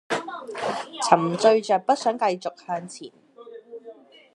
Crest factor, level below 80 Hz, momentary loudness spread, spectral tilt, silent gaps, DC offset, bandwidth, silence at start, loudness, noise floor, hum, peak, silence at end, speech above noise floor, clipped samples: 24 dB; -78 dBFS; 23 LU; -4.5 dB/octave; none; under 0.1%; 11.5 kHz; 0.1 s; -23 LUFS; -47 dBFS; none; 0 dBFS; 0.4 s; 24 dB; under 0.1%